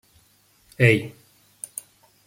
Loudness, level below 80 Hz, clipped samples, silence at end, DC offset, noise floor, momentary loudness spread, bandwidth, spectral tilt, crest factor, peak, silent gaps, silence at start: -20 LUFS; -60 dBFS; under 0.1%; 1.15 s; under 0.1%; -60 dBFS; 21 LU; 16.5 kHz; -5.5 dB/octave; 24 dB; -2 dBFS; none; 0.8 s